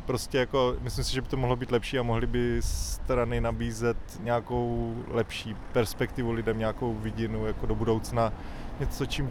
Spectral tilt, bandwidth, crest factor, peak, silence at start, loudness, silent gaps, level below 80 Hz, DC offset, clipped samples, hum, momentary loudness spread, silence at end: -5.5 dB/octave; 18.5 kHz; 18 dB; -12 dBFS; 0 s; -30 LUFS; none; -36 dBFS; under 0.1%; under 0.1%; none; 5 LU; 0 s